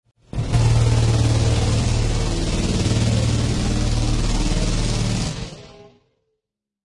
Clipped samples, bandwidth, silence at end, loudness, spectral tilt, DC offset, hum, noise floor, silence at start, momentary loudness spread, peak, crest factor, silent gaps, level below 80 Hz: under 0.1%; 11.5 kHz; 0.95 s; -20 LUFS; -5.5 dB/octave; under 0.1%; none; -81 dBFS; 0.35 s; 8 LU; -6 dBFS; 14 dB; none; -26 dBFS